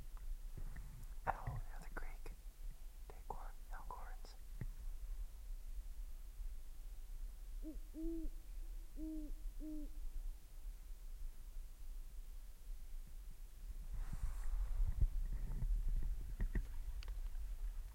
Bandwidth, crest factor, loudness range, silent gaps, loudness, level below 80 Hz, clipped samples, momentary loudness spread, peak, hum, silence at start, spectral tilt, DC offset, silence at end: 16.5 kHz; 22 dB; 10 LU; none; -51 LUFS; -44 dBFS; under 0.1%; 13 LU; -22 dBFS; none; 0 s; -6.5 dB/octave; under 0.1%; 0 s